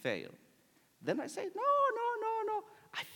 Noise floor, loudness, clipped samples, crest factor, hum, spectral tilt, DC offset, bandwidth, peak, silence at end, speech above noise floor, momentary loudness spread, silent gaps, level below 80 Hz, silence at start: -69 dBFS; -36 LUFS; under 0.1%; 16 dB; none; -4.5 dB/octave; under 0.1%; 18 kHz; -20 dBFS; 0 s; 35 dB; 13 LU; none; under -90 dBFS; 0 s